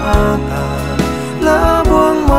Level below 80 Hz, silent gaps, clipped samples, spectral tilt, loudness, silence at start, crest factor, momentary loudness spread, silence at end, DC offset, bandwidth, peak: -20 dBFS; none; under 0.1%; -6.5 dB/octave; -13 LUFS; 0 s; 12 dB; 7 LU; 0 s; 1%; 16 kHz; 0 dBFS